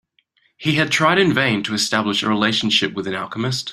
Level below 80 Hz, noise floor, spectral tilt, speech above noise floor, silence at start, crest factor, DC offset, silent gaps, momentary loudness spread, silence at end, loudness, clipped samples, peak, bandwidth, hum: -58 dBFS; -63 dBFS; -4 dB/octave; 44 dB; 0.6 s; 18 dB; under 0.1%; none; 9 LU; 0 s; -18 LUFS; under 0.1%; -2 dBFS; 15 kHz; none